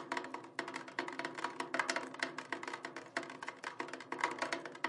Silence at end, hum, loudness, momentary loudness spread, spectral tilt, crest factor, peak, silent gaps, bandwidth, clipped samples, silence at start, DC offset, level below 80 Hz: 0 s; none; -41 LUFS; 8 LU; -2 dB/octave; 26 dB; -16 dBFS; none; 11.5 kHz; under 0.1%; 0 s; under 0.1%; under -90 dBFS